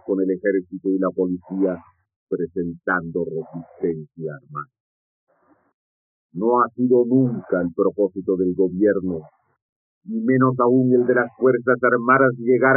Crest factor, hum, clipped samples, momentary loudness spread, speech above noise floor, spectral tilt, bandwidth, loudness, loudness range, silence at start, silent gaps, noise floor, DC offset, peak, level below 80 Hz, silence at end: 18 dB; none; under 0.1%; 14 LU; over 70 dB; -3 dB/octave; 2.9 kHz; -20 LUFS; 9 LU; 0.05 s; 2.16-2.27 s, 4.80-5.27 s, 5.74-6.29 s, 9.62-10.01 s; under -90 dBFS; under 0.1%; -4 dBFS; -64 dBFS; 0 s